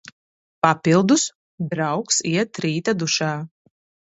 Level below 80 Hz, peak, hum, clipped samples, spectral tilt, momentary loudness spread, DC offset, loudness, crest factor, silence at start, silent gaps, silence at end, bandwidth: -62 dBFS; 0 dBFS; none; under 0.1%; -4 dB/octave; 11 LU; under 0.1%; -20 LUFS; 22 dB; 0.65 s; 1.35-1.58 s; 0.65 s; 8.2 kHz